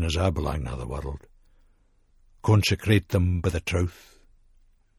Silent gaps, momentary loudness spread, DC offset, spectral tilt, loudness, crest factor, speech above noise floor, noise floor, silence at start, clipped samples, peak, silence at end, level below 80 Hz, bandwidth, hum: none; 12 LU; under 0.1%; -6 dB/octave; -25 LUFS; 20 dB; 37 dB; -61 dBFS; 0 s; under 0.1%; -6 dBFS; 1.05 s; -38 dBFS; 13.5 kHz; none